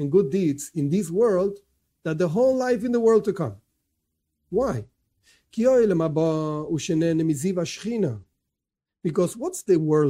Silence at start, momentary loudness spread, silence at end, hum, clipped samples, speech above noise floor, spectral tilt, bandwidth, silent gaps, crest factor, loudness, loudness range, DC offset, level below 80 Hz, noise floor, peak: 0 s; 11 LU; 0 s; none; under 0.1%; 64 dB; -7 dB/octave; 16 kHz; none; 16 dB; -23 LUFS; 3 LU; under 0.1%; -58 dBFS; -86 dBFS; -8 dBFS